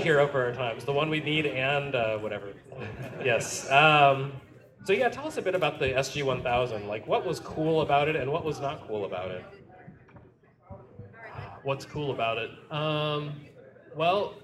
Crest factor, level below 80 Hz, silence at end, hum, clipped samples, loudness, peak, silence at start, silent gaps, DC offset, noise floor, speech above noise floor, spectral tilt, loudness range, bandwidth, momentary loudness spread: 24 dB; -58 dBFS; 0.05 s; none; under 0.1%; -27 LUFS; -6 dBFS; 0 s; none; under 0.1%; -57 dBFS; 30 dB; -4.5 dB/octave; 11 LU; 14 kHz; 17 LU